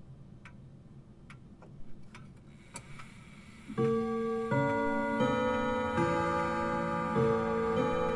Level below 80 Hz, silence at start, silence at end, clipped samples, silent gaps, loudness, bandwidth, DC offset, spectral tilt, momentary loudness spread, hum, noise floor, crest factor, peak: -56 dBFS; 0 s; 0 s; under 0.1%; none; -31 LUFS; 11.5 kHz; under 0.1%; -7 dB/octave; 23 LU; none; -53 dBFS; 16 dB; -16 dBFS